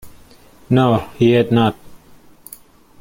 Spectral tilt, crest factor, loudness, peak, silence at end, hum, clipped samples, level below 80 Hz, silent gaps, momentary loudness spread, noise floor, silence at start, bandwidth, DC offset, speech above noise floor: -7.5 dB/octave; 16 dB; -16 LUFS; -2 dBFS; 1.05 s; none; under 0.1%; -48 dBFS; none; 24 LU; -46 dBFS; 0.05 s; 16.5 kHz; under 0.1%; 32 dB